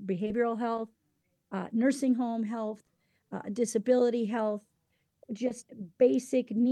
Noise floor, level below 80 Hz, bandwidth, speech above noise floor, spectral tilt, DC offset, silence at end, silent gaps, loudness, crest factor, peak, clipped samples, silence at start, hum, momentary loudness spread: -76 dBFS; -74 dBFS; 12.5 kHz; 47 dB; -6 dB/octave; under 0.1%; 0 s; none; -30 LUFS; 18 dB; -14 dBFS; under 0.1%; 0 s; none; 16 LU